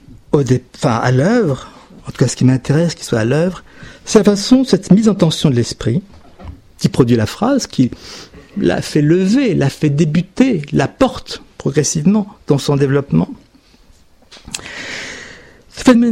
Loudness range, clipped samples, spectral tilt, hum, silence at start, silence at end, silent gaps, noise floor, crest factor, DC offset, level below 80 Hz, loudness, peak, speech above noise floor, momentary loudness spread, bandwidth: 4 LU; under 0.1%; -6 dB/octave; none; 0.35 s; 0 s; none; -47 dBFS; 14 dB; under 0.1%; -42 dBFS; -15 LUFS; 0 dBFS; 33 dB; 16 LU; 15.5 kHz